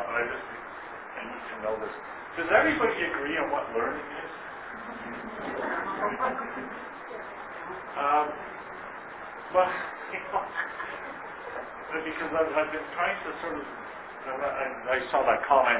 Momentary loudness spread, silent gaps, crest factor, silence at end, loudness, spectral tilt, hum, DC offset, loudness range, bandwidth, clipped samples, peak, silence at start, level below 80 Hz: 14 LU; none; 22 dB; 0 s; -31 LUFS; -1.5 dB/octave; none; under 0.1%; 5 LU; 4 kHz; under 0.1%; -8 dBFS; 0 s; -62 dBFS